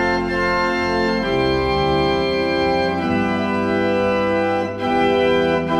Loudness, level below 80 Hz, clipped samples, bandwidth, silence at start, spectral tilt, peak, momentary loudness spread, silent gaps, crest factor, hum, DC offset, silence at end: -18 LUFS; -38 dBFS; under 0.1%; 12 kHz; 0 s; -6 dB/octave; -6 dBFS; 3 LU; none; 12 dB; none; under 0.1%; 0 s